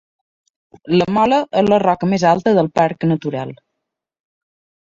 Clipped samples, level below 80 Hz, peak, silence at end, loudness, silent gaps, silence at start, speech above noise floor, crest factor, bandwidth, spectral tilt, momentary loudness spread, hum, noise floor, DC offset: under 0.1%; -54 dBFS; -2 dBFS; 1.35 s; -16 LUFS; none; 0.85 s; 64 dB; 16 dB; 7.6 kHz; -7 dB/octave; 8 LU; none; -79 dBFS; under 0.1%